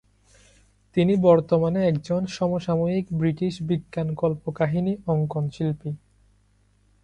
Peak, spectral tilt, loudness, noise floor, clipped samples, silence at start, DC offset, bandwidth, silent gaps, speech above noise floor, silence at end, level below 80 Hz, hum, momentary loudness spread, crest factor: -6 dBFS; -8.5 dB/octave; -24 LUFS; -62 dBFS; under 0.1%; 0.95 s; under 0.1%; 9.2 kHz; none; 39 dB; 1.05 s; -54 dBFS; none; 9 LU; 20 dB